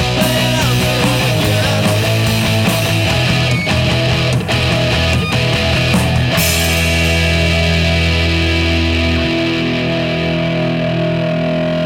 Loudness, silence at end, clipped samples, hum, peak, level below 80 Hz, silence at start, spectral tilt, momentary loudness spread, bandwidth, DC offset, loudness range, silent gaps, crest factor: -14 LUFS; 0 s; under 0.1%; none; -4 dBFS; -26 dBFS; 0 s; -5 dB/octave; 3 LU; 17.5 kHz; under 0.1%; 2 LU; none; 10 dB